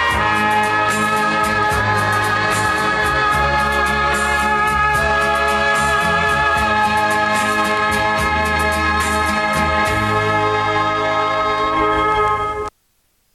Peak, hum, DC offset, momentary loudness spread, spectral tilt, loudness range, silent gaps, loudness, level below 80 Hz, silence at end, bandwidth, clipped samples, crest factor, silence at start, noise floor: -4 dBFS; none; under 0.1%; 2 LU; -4 dB/octave; 1 LU; none; -16 LUFS; -34 dBFS; 0.65 s; 14 kHz; under 0.1%; 14 dB; 0 s; -62 dBFS